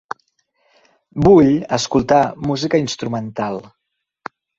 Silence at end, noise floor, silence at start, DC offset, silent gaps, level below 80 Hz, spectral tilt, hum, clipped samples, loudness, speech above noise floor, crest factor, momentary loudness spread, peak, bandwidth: 0.95 s; -65 dBFS; 1.15 s; under 0.1%; none; -44 dBFS; -6 dB/octave; none; under 0.1%; -16 LUFS; 49 dB; 16 dB; 22 LU; -2 dBFS; 8 kHz